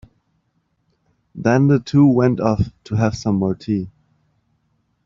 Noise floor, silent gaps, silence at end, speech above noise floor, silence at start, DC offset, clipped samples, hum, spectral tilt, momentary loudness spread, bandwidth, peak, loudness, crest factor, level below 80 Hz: -67 dBFS; none; 1.15 s; 51 dB; 1.35 s; under 0.1%; under 0.1%; none; -8 dB/octave; 10 LU; 7.4 kHz; -2 dBFS; -18 LUFS; 18 dB; -46 dBFS